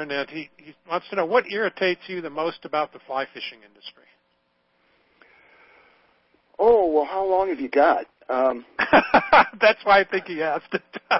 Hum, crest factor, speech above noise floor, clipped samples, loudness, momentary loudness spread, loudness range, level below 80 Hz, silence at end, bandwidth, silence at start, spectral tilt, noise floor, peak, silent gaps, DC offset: none; 22 dB; 47 dB; under 0.1%; -21 LUFS; 16 LU; 14 LU; -56 dBFS; 0 s; 5.8 kHz; 0 s; -7.5 dB/octave; -69 dBFS; -2 dBFS; none; under 0.1%